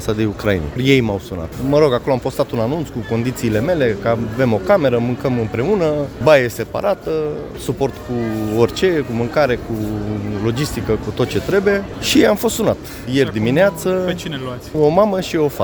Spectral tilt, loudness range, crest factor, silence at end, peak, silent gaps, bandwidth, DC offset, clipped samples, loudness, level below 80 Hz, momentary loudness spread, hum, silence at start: -6 dB/octave; 2 LU; 16 dB; 0 s; 0 dBFS; none; over 20 kHz; under 0.1%; under 0.1%; -18 LUFS; -38 dBFS; 9 LU; none; 0 s